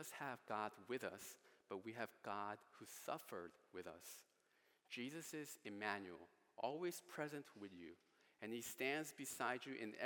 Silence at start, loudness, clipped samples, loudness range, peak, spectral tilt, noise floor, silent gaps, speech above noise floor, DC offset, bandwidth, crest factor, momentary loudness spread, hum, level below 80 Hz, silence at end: 0 s; -50 LUFS; under 0.1%; 5 LU; -26 dBFS; -3.5 dB/octave; -80 dBFS; none; 29 dB; under 0.1%; 18 kHz; 24 dB; 13 LU; none; under -90 dBFS; 0 s